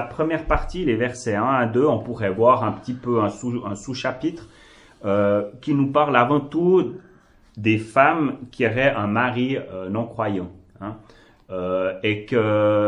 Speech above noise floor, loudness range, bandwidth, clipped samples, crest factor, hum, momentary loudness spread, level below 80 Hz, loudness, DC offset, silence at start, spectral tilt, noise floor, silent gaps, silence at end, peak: 29 dB; 5 LU; 11 kHz; under 0.1%; 22 dB; none; 12 LU; -42 dBFS; -22 LUFS; under 0.1%; 0 s; -7 dB/octave; -50 dBFS; none; 0 s; 0 dBFS